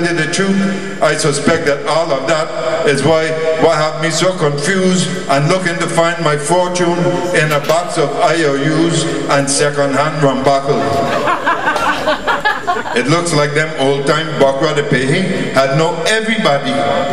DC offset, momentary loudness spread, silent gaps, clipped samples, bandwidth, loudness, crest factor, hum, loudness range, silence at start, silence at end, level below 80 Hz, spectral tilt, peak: 4%; 3 LU; none; under 0.1%; 15.5 kHz; -14 LUFS; 14 dB; none; 1 LU; 0 s; 0 s; -48 dBFS; -4.5 dB/octave; 0 dBFS